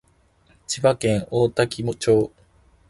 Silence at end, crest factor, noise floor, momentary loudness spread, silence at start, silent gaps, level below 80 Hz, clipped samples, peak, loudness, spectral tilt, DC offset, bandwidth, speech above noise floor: 0.6 s; 18 dB; -59 dBFS; 6 LU; 0.7 s; none; -50 dBFS; under 0.1%; -4 dBFS; -22 LUFS; -5.5 dB/octave; under 0.1%; 12 kHz; 39 dB